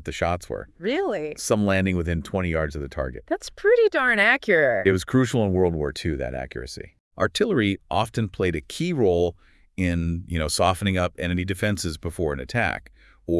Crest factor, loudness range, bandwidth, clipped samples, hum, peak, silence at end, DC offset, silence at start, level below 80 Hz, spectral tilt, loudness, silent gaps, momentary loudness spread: 20 dB; 5 LU; 12 kHz; under 0.1%; none; -4 dBFS; 0 s; under 0.1%; 0 s; -44 dBFS; -5.5 dB/octave; -23 LUFS; 7.00-7.11 s; 12 LU